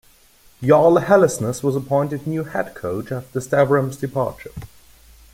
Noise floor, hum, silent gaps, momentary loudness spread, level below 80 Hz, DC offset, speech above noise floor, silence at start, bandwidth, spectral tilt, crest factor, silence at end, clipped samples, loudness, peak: -52 dBFS; none; none; 13 LU; -50 dBFS; under 0.1%; 33 dB; 0.6 s; 16.5 kHz; -6.5 dB/octave; 18 dB; 0.65 s; under 0.1%; -19 LUFS; -2 dBFS